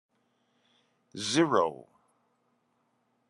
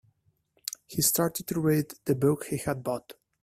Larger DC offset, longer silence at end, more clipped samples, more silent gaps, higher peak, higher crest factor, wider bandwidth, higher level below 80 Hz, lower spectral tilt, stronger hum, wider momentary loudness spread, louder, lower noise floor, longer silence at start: neither; first, 1.55 s vs 0.3 s; neither; neither; about the same, -10 dBFS vs -10 dBFS; about the same, 24 dB vs 20 dB; second, 11 kHz vs 16 kHz; second, -82 dBFS vs -60 dBFS; about the same, -4 dB/octave vs -4.5 dB/octave; neither; first, 23 LU vs 13 LU; about the same, -28 LUFS vs -28 LUFS; first, -74 dBFS vs -70 dBFS; first, 1.15 s vs 0.9 s